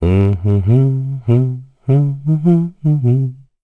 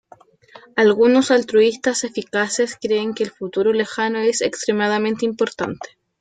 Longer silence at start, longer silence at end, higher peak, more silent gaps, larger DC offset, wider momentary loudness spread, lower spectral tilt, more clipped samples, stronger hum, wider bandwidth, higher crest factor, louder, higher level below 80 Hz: second, 0 s vs 0.55 s; about the same, 0.3 s vs 0.35 s; about the same, -4 dBFS vs -4 dBFS; neither; first, 0.2% vs under 0.1%; second, 6 LU vs 10 LU; first, -11 dB/octave vs -3.5 dB/octave; neither; neither; second, 3.7 kHz vs 9.4 kHz; about the same, 12 dB vs 14 dB; first, -15 LUFS vs -19 LUFS; first, -38 dBFS vs -62 dBFS